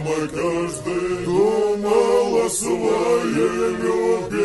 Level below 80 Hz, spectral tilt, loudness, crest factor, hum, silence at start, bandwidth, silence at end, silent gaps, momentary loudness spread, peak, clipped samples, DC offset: -48 dBFS; -5 dB/octave; -20 LUFS; 14 dB; none; 0 s; 12 kHz; 0 s; none; 6 LU; -6 dBFS; under 0.1%; under 0.1%